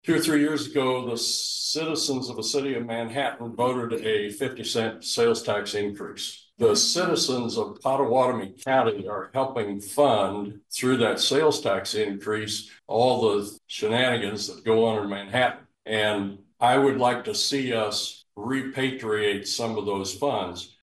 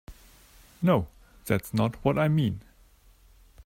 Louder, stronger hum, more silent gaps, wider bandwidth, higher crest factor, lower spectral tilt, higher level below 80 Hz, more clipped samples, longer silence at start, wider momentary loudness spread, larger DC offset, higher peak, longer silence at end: about the same, -25 LUFS vs -27 LUFS; neither; neither; second, 12.5 kHz vs 16 kHz; about the same, 18 dB vs 20 dB; second, -3.5 dB/octave vs -7.5 dB/octave; second, -68 dBFS vs -52 dBFS; neither; about the same, 0.05 s vs 0.1 s; second, 9 LU vs 16 LU; neither; about the same, -8 dBFS vs -8 dBFS; second, 0.15 s vs 1.05 s